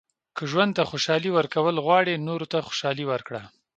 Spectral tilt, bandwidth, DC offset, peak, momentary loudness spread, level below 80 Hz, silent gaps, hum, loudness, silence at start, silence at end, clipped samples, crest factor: -5 dB/octave; 9 kHz; under 0.1%; -6 dBFS; 12 LU; -66 dBFS; none; none; -24 LUFS; 0.35 s; 0.3 s; under 0.1%; 20 dB